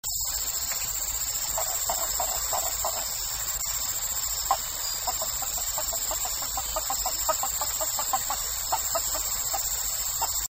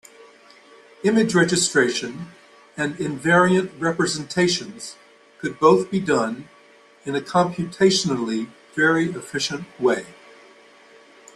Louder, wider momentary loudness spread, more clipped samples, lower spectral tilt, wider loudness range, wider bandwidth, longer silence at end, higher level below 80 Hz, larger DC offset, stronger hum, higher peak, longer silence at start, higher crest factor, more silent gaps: second, -26 LUFS vs -21 LUFS; second, 2 LU vs 17 LU; neither; second, 0.5 dB/octave vs -4 dB/octave; about the same, 1 LU vs 2 LU; first, 16.5 kHz vs 12.5 kHz; second, 0.1 s vs 1.25 s; first, -46 dBFS vs -62 dBFS; neither; neither; second, -10 dBFS vs -2 dBFS; second, 0.05 s vs 1.05 s; about the same, 20 dB vs 20 dB; neither